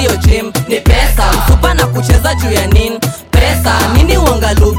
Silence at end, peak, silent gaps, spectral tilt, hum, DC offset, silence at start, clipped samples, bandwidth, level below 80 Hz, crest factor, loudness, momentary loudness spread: 0 s; 0 dBFS; none; -5 dB/octave; none; under 0.1%; 0 s; under 0.1%; 17 kHz; -14 dBFS; 10 dB; -11 LUFS; 4 LU